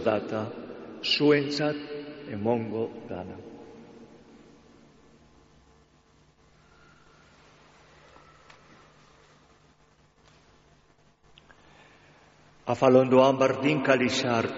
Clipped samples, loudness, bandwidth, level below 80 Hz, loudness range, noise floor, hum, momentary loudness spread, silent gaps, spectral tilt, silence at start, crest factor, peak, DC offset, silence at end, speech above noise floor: under 0.1%; -25 LUFS; 7.6 kHz; -66 dBFS; 21 LU; -62 dBFS; none; 22 LU; none; -4 dB/octave; 0 s; 22 dB; -8 dBFS; under 0.1%; 0 s; 37 dB